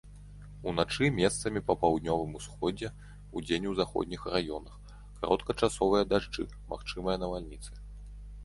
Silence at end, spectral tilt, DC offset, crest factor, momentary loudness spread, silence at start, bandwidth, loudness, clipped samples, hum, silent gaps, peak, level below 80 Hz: 0 s; -5 dB/octave; under 0.1%; 22 dB; 21 LU; 0.05 s; 11.5 kHz; -32 LUFS; under 0.1%; 50 Hz at -45 dBFS; none; -10 dBFS; -48 dBFS